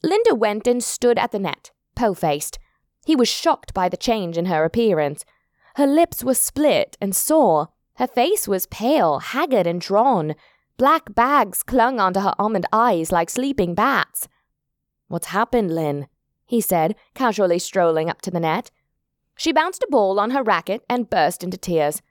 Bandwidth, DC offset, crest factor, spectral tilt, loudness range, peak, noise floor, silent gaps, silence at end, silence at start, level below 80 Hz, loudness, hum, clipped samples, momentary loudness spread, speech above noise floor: 19.5 kHz; under 0.1%; 16 dB; -4 dB/octave; 3 LU; -4 dBFS; -78 dBFS; none; 0.15 s; 0.05 s; -50 dBFS; -20 LUFS; none; under 0.1%; 9 LU; 58 dB